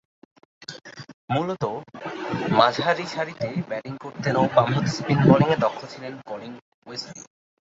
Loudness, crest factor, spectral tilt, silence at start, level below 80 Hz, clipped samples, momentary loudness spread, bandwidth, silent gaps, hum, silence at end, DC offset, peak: -23 LUFS; 22 dB; -6.5 dB/octave; 0.7 s; -58 dBFS; under 0.1%; 21 LU; 7.8 kHz; 1.14-1.28 s, 6.62-6.82 s; none; 0.55 s; under 0.1%; -2 dBFS